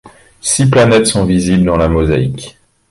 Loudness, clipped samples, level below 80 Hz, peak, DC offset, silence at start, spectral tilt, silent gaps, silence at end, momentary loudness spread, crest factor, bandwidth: -11 LUFS; under 0.1%; -28 dBFS; 0 dBFS; under 0.1%; 0.05 s; -5 dB/octave; none; 0.4 s; 12 LU; 12 dB; 11.5 kHz